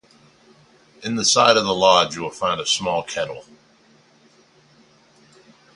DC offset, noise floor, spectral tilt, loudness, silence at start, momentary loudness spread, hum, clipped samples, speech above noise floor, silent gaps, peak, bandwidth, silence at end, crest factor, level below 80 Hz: under 0.1%; -55 dBFS; -2 dB/octave; -18 LUFS; 1 s; 14 LU; none; under 0.1%; 36 dB; none; 0 dBFS; 11.5 kHz; 2.35 s; 22 dB; -58 dBFS